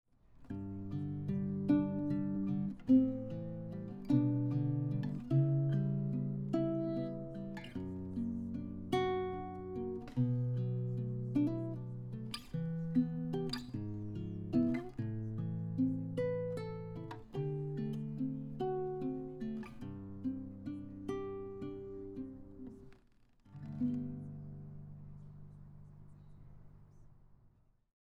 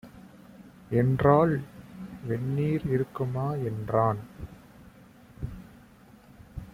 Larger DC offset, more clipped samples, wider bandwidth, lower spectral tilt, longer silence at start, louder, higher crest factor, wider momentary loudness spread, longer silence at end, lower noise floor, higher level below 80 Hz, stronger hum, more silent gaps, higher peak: neither; neither; second, 10.5 kHz vs 15.5 kHz; about the same, -9 dB/octave vs -9.5 dB/octave; first, 0.3 s vs 0.05 s; second, -38 LUFS vs -27 LUFS; about the same, 20 dB vs 22 dB; second, 15 LU vs 23 LU; first, 0.55 s vs 0.05 s; first, -68 dBFS vs -54 dBFS; second, -60 dBFS vs -52 dBFS; neither; neither; second, -18 dBFS vs -8 dBFS